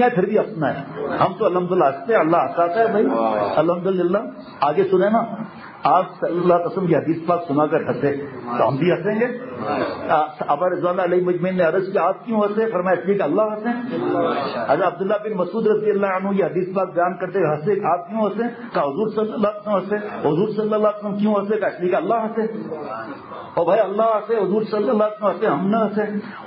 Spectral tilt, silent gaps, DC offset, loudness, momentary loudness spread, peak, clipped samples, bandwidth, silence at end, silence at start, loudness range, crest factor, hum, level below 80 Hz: -12 dB/octave; none; under 0.1%; -20 LUFS; 6 LU; -4 dBFS; under 0.1%; 5.6 kHz; 0 s; 0 s; 3 LU; 16 dB; none; -62 dBFS